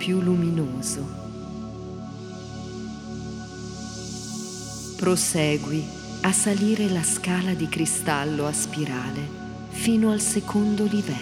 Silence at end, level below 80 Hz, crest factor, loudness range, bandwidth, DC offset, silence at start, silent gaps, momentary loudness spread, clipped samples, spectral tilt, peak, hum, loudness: 0 s; -50 dBFS; 18 dB; 11 LU; 16.5 kHz; under 0.1%; 0 s; none; 15 LU; under 0.1%; -4.5 dB/octave; -6 dBFS; none; -25 LUFS